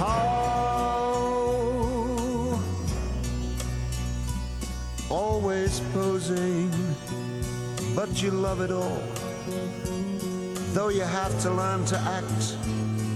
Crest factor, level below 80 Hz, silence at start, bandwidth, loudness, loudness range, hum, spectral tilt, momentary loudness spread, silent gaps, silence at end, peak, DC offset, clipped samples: 16 dB; -38 dBFS; 0 s; 13.5 kHz; -28 LUFS; 2 LU; none; -5.5 dB/octave; 6 LU; none; 0 s; -12 dBFS; under 0.1%; under 0.1%